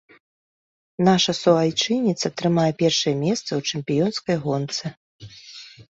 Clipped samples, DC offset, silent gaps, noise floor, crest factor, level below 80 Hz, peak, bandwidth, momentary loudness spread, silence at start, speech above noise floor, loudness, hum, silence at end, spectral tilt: under 0.1%; under 0.1%; 4.97-5.19 s; -43 dBFS; 18 dB; -60 dBFS; -4 dBFS; 8 kHz; 21 LU; 1 s; 22 dB; -21 LUFS; none; 0.15 s; -5 dB/octave